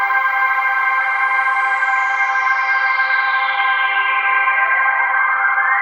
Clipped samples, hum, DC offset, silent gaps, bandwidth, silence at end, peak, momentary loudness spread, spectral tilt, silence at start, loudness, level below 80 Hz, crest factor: under 0.1%; none; under 0.1%; none; 16 kHz; 0 s; -4 dBFS; 1 LU; 2.5 dB/octave; 0 s; -15 LUFS; under -90 dBFS; 12 dB